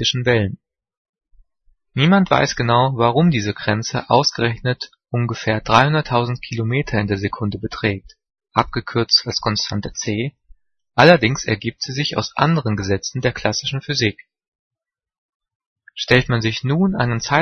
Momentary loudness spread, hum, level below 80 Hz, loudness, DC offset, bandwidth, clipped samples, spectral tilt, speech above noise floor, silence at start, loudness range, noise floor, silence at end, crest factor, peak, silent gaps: 10 LU; none; -46 dBFS; -18 LUFS; under 0.1%; 6.6 kHz; under 0.1%; -5 dB/octave; 42 dB; 0 s; 4 LU; -60 dBFS; 0 s; 20 dB; 0 dBFS; 0.97-1.13 s, 14.48-14.71 s, 15.18-15.40 s, 15.55-15.60 s, 15.66-15.76 s